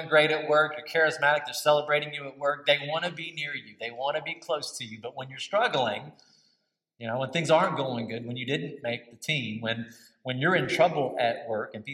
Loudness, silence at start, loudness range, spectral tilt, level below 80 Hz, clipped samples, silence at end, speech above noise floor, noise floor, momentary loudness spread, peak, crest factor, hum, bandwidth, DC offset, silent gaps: -27 LUFS; 0 s; 5 LU; -4 dB/octave; -78 dBFS; under 0.1%; 0 s; 47 dB; -75 dBFS; 12 LU; -8 dBFS; 20 dB; none; 16 kHz; under 0.1%; none